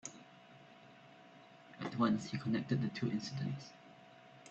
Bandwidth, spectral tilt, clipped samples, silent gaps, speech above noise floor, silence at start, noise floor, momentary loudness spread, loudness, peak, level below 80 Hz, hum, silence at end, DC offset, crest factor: 8.2 kHz; -6 dB/octave; under 0.1%; none; 23 dB; 0.05 s; -60 dBFS; 24 LU; -38 LUFS; -20 dBFS; -74 dBFS; none; 0 s; under 0.1%; 20 dB